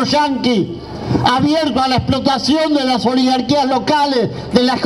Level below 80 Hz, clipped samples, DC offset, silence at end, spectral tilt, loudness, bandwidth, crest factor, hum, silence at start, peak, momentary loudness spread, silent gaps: -40 dBFS; under 0.1%; under 0.1%; 0 s; -5.5 dB/octave; -15 LUFS; 13 kHz; 14 dB; none; 0 s; 0 dBFS; 4 LU; none